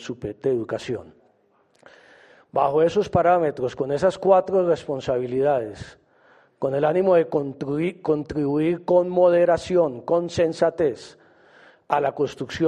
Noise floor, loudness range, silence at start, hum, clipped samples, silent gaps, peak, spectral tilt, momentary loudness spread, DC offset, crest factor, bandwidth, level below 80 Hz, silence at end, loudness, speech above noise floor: -62 dBFS; 3 LU; 0 s; none; under 0.1%; none; -4 dBFS; -7 dB/octave; 11 LU; under 0.1%; 18 dB; 9.8 kHz; -56 dBFS; 0 s; -22 LUFS; 41 dB